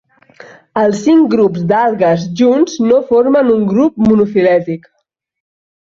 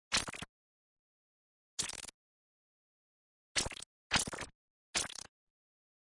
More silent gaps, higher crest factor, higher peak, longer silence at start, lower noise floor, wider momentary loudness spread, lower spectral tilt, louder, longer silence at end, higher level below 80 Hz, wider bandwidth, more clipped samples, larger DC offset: second, none vs 0.49-1.77 s, 2.14-3.55 s, 3.86-4.10 s, 4.55-4.93 s; second, 12 dB vs 26 dB; first, 0 dBFS vs -18 dBFS; first, 0.75 s vs 0.1 s; second, -39 dBFS vs under -90 dBFS; second, 5 LU vs 15 LU; first, -7 dB/octave vs -1 dB/octave; first, -12 LUFS vs -37 LUFS; first, 1.15 s vs 1 s; first, -50 dBFS vs -62 dBFS; second, 7.6 kHz vs 11.5 kHz; neither; neither